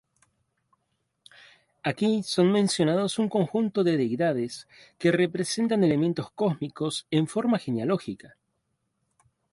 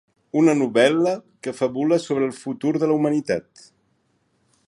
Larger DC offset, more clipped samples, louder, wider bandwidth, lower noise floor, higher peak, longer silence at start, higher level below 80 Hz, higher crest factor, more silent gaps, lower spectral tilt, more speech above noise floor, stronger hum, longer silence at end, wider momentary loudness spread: neither; neither; second, -26 LUFS vs -21 LUFS; about the same, 11.5 kHz vs 11.5 kHz; first, -77 dBFS vs -67 dBFS; second, -10 dBFS vs -4 dBFS; first, 1.85 s vs 0.35 s; about the same, -68 dBFS vs -66 dBFS; about the same, 18 dB vs 18 dB; neither; about the same, -5.5 dB/octave vs -6 dB/octave; first, 52 dB vs 46 dB; neither; about the same, 1.25 s vs 1.25 s; about the same, 8 LU vs 9 LU